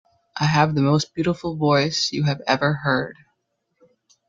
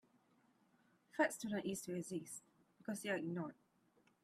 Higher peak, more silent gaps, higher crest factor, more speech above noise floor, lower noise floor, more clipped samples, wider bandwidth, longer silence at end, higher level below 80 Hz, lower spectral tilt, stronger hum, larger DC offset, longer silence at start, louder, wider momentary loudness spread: first, -2 dBFS vs -24 dBFS; neither; about the same, 20 dB vs 22 dB; first, 53 dB vs 33 dB; about the same, -73 dBFS vs -76 dBFS; neither; second, 7.6 kHz vs 15.5 kHz; first, 1.15 s vs 0.7 s; first, -56 dBFS vs -84 dBFS; about the same, -5.5 dB/octave vs -4.5 dB/octave; neither; neither; second, 0.35 s vs 1.15 s; first, -21 LUFS vs -43 LUFS; second, 6 LU vs 13 LU